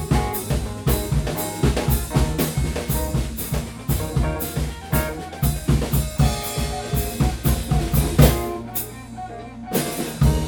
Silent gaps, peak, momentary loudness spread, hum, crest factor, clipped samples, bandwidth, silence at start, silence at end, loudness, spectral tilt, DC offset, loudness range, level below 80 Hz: none; 0 dBFS; 7 LU; none; 20 dB; under 0.1%; over 20 kHz; 0 s; 0 s; -22 LUFS; -5.5 dB/octave; under 0.1%; 3 LU; -26 dBFS